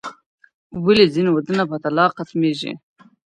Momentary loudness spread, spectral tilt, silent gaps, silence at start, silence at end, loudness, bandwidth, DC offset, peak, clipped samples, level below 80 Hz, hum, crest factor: 18 LU; -6.5 dB/octave; 0.26-0.38 s, 0.54-0.70 s; 0.05 s; 0.55 s; -18 LUFS; 10.5 kHz; under 0.1%; -2 dBFS; under 0.1%; -58 dBFS; none; 18 dB